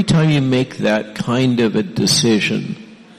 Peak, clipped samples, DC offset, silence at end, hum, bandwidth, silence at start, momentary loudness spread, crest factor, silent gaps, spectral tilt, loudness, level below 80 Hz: -4 dBFS; under 0.1%; under 0.1%; 0.25 s; none; 13 kHz; 0 s; 8 LU; 14 dB; none; -5 dB/octave; -16 LUFS; -46 dBFS